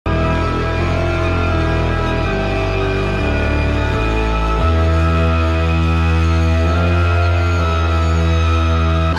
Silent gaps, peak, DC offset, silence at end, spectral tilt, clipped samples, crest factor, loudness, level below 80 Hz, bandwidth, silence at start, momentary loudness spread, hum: none; -4 dBFS; under 0.1%; 0 s; -7 dB/octave; under 0.1%; 10 dB; -16 LUFS; -20 dBFS; 7.4 kHz; 0.05 s; 3 LU; none